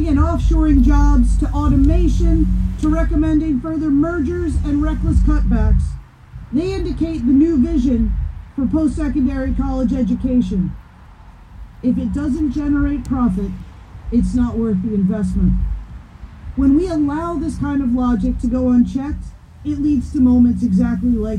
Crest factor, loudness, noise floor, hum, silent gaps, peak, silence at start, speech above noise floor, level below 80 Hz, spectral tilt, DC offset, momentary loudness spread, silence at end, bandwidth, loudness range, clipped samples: 12 dB; -18 LUFS; -41 dBFS; none; none; -4 dBFS; 0 s; 25 dB; -22 dBFS; -9 dB/octave; under 0.1%; 11 LU; 0 s; 9.8 kHz; 4 LU; under 0.1%